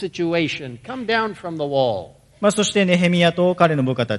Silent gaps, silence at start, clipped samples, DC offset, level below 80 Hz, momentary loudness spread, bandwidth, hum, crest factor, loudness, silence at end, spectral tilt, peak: none; 0 s; under 0.1%; under 0.1%; -58 dBFS; 12 LU; 11.5 kHz; none; 18 dB; -19 LUFS; 0 s; -5 dB/octave; 0 dBFS